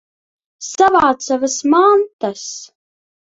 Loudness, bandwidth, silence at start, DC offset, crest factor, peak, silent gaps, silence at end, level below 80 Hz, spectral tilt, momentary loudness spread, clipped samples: -14 LUFS; 8 kHz; 0.6 s; under 0.1%; 16 dB; 0 dBFS; 2.13-2.19 s; 0.6 s; -56 dBFS; -3 dB/octave; 17 LU; under 0.1%